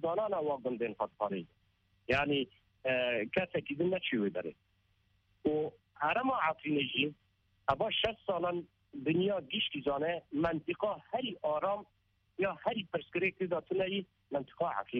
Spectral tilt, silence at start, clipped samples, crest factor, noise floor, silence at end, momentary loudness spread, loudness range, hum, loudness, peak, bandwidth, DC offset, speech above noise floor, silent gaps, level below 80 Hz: -3 dB/octave; 0 s; under 0.1%; 20 dB; -74 dBFS; 0 s; 8 LU; 2 LU; none; -35 LUFS; -14 dBFS; 7.4 kHz; under 0.1%; 39 dB; none; -64 dBFS